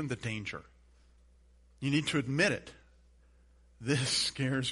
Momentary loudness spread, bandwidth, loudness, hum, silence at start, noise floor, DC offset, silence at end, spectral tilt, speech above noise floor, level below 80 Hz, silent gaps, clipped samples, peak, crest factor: 13 LU; 11.5 kHz; -32 LUFS; none; 0 s; -62 dBFS; under 0.1%; 0 s; -4 dB/octave; 30 dB; -60 dBFS; none; under 0.1%; -14 dBFS; 20 dB